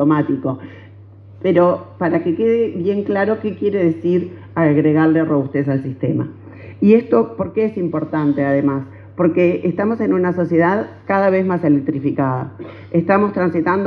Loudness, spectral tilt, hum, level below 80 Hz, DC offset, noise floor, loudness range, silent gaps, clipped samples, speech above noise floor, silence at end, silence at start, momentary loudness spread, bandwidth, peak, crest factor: -17 LUFS; -10.5 dB/octave; none; -60 dBFS; under 0.1%; -40 dBFS; 1 LU; none; under 0.1%; 24 dB; 0 s; 0 s; 9 LU; 5 kHz; 0 dBFS; 16 dB